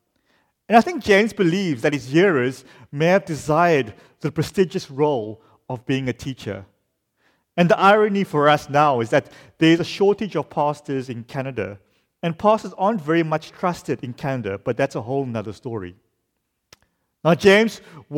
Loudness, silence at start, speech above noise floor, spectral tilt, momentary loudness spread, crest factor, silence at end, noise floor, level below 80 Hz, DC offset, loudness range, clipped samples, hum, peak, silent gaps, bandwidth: -20 LUFS; 0.7 s; 55 dB; -6 dB/octave; 14 LU; 18 dB; 0 s; -75 dBFS; -56 dBFS; under 0.1%; 7 LU; under 0.1%; none; -2 dBFS; none; 16 kHz